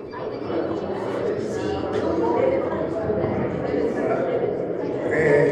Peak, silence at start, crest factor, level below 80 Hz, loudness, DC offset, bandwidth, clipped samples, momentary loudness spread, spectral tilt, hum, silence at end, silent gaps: -6 dBFS; 0 s; 16 dB; -50 dBFS; -24 LUFS; under 0.1%; 9.4 kHz; under 0.1%; 6 LU; -7.5 dB/octave; none; 0 s; none